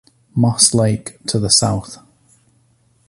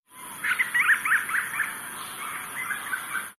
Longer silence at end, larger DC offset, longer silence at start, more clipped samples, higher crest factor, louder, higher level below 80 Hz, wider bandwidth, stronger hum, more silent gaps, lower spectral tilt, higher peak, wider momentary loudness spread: first, 1.15 s vs 0.05 s; neither; first, 0.35 s vs 0.1 s; neither; about the same, 18 dB vs 18 dB; first, -15 LUFS vs -26 LUFS; first, -44 dBFS vs -72 dBFS; second, 11.5 kHz vs 14.5 kHz; neither; neither; first, -4 dB/octave vs 0 dB/octave; first, 0 dBFS vs -12 dBFS; about the same, 13 LU vs 13 LU